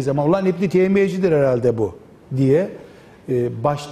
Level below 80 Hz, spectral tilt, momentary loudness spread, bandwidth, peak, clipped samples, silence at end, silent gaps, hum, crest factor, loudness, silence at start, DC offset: -52 dBFS; -8 dB/octave; 9 LU; 12 kHz; -6 dBFS; under 0.1%; 0 s; none; none; 12 dB; -19 LUFS; 0 s; under 0.1%